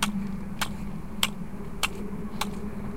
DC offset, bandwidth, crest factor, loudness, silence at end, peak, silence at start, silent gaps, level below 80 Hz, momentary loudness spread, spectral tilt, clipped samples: 2%; 16.5 kHz; 26 dB; -32 LUFS; 0 s; -6 dBFS; 0 s; none; -42 dBFS; 8 LU; -3.5 dB/octave; under 0.1%